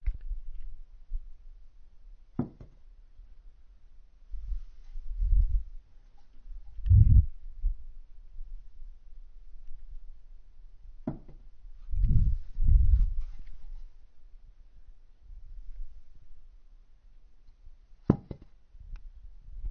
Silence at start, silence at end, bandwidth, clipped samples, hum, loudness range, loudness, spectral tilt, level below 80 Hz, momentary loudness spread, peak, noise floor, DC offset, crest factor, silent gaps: 0 s; 0 s; 2.1 kHz; under 0.1%; none; 19 LU; -30 LUFS; -12 dB/octave; -32 dBFS; 27 LU; -6 dBFS; -53 dBFS; under 0.1%; 24 dB; none